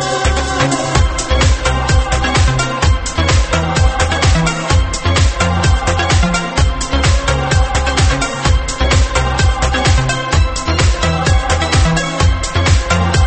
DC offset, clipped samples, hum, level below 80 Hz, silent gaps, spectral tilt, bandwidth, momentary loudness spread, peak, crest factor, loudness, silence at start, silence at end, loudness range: under 0.1%; under 0.1%; none; -18 dBFS; none; -4.5 dB/octave; 8.8 kHz; 2 LU; 0 dBFS; 12 dB; -14 LUFS; 0 s; 0 s; 0 LU